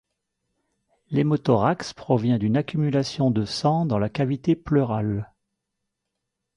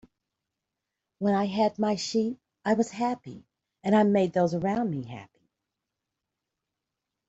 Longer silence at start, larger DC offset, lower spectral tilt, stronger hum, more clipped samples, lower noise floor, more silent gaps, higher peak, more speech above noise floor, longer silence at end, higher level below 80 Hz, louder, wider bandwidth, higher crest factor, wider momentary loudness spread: about the same, 1.1 s vs 1.2 s; neither; first, -7.5 dB/octave vs -6 dB/octave; neither; neither; second, -81 dBFS vs -86 dBFS; neither; first, -6 dBFS vs -12 dBFS; about the same, 59 dB vs 60 dB; second, 1.3 s vs 2.05 s; first, -54 dBFS vs -68 dBFS; first, -23 LUFS vs -27 LUFS; first, 11 kHz vs 8 kHz; about the same, 18 dB vs 18 dB; second, 7 LU vs 13 LU